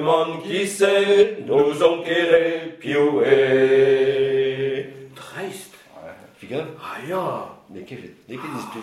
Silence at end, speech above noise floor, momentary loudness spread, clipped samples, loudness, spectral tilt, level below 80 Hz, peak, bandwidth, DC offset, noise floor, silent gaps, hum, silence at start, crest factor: 0 s; 22 dB; 21 LU; under 0.1%; -19 LUFS; -5 dB/octave; -64 dBFS; -2 dBFS; 13 kHz; under 0.1%; -41 dBFS; none; none; 0 s; 18 dB